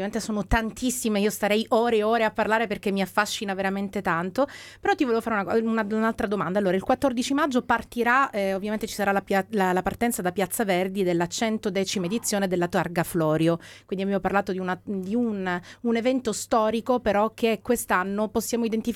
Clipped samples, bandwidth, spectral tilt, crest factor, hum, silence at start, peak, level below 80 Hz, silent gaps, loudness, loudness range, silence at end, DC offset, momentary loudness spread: under 0.1%; 17.5 kHz; -4.5 dB/octave; 18 dB; none; 0 s; -8 dBFS; -48 dBFS; none; -25 LUFS; 2 LU; 0 s; under 0.1%; 5 LU